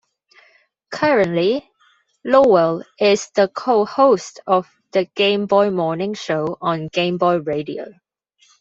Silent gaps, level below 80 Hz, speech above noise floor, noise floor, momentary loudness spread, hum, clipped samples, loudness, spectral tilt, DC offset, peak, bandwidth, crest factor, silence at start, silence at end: none; -62 dBFS; 42 dB; -59 dBFS; 10 LU; none; under 0.1%; -18 LUFS; -5.5 dB/octave; under 0.1%; -2 dBFS; 8 kHz; 16 dB; 0.9 s; 0.7 s